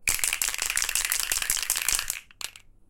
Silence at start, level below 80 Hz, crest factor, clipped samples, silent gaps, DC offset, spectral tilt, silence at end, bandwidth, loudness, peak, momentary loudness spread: 0 s; -46 dBFS; 24 dB; under 0.1%; none; under 0.1%; 2 dB/octave; 0.3 s; 17 kHz; -25 LUFS; -4 dBFS; 12 LU